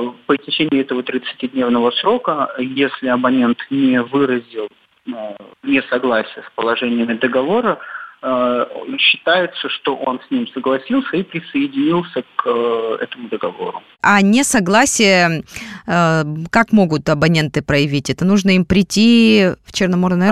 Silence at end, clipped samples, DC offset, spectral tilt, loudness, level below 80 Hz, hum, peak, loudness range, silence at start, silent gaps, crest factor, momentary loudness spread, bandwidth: 0 s; under 0.1%; under 0.1%; -4.5 dB/octave; -16 LUFS; -46 dBFS; none; 0 dBFS; 5 LU; 0 s; none; 16 dB; 12 LU; 14 kHz